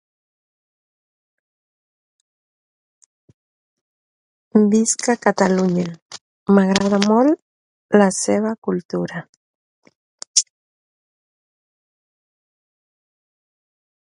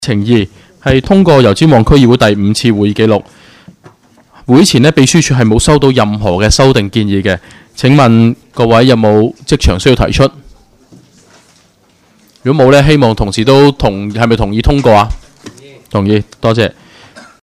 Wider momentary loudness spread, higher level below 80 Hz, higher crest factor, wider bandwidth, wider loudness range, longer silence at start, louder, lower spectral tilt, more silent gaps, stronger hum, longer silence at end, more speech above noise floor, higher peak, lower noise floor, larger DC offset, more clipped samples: first, 15 LU vs 8 LU; second, -62 dBFS vs -24 dBFS; first, 22 dB vs 10 dB; second, 11.5 kHz vs 14 kHz; first, 9 LU vs 4 LU; first, 4.55 s vs 0 s; second, -18 LUFS vs -9 LUFS; second, -4.5 dB/octave vs -6 dB/octave; first, 6.02-6.10 s, 6.21-6.46 s, 7.42-7.89 s, 8.58-8.62 s, 8.85-8.89 s, 9.29-9.82 s, 9.95-10.18 s, 10.27-10.34 s vs none; neither; first, 3.6 s vs 0.7 s; first, over 73 dB vs 41 dB; about the same, 0 dBFS vs 0 dBFS; first, under -90 dBFS vs -49 dBFS; neither; second, under 0.1% vs 0.9%